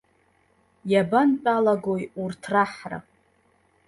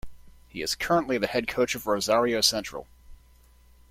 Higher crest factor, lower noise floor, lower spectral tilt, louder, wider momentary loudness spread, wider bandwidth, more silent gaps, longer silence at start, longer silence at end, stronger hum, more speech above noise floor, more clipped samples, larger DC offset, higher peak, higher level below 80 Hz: about the same, 18 dB vs 22 dB; first, -64 dBFS vs -56 dBFS; first, -7 dB/octave vs -3 dB/octave; about the same, -23 LUFS vs -25 LUFS; about the same, 16 LU vs 14 LU; second, 11.5 kHz vs 16.5 kHz; neither; first, 0.85 s vs 0.05 s; about the same, 0.85 s vs 0.75 s; second, none vs 60 Hz at -55 dBFS; first, 41 dB vs 30 dB; neither; neither; about the same, -8 dBFS vs -6 dBFS; second, -66 dBFS vs -52 dBFS